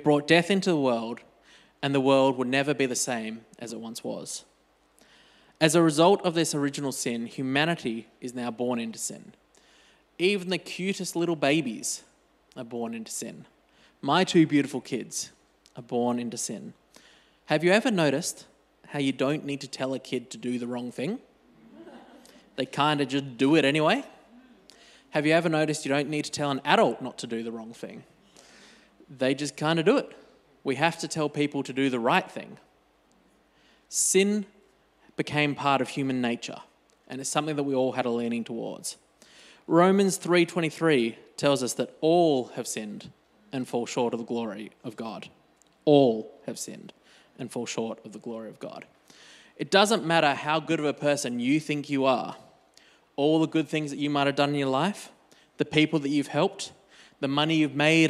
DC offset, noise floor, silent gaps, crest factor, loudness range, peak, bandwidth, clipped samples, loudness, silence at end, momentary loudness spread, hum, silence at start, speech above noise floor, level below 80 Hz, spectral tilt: under 0.1%; -64 dBFS; none; 24 dB; 6 LU; -4 dBFS; 14.5 kHz; under 0.1%; -26 LUFS; 0 s; 17 LU; none; 0 s; 38 dB; -74 dBFS; -4.5 dB/octave